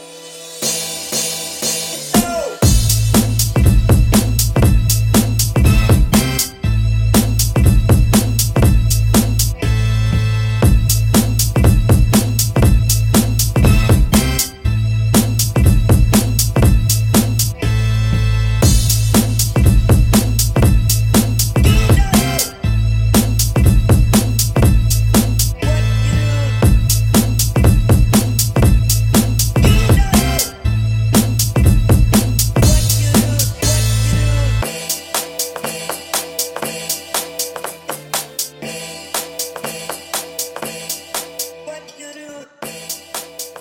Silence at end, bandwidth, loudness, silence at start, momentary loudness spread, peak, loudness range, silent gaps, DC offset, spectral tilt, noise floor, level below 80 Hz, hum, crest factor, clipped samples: 0 s; 17 kHz; -14 LUFS; 0 s; 11 LU; 0 dBFS; 9 LU; none; under 0.1%; -5 dB/octave; -36 dBFS; -20 dBFS; none; 14 dB; under 0.1%